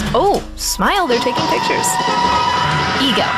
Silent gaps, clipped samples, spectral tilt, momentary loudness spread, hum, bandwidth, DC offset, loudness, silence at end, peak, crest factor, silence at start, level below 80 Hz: none; under 0.1%; -3 dB/octave; 2 LU; none; 15.5 kHz; under 0.1%; -15 LUFS; 0 s; -4 dBFS; 12 dB; 0 s; -34 dBFS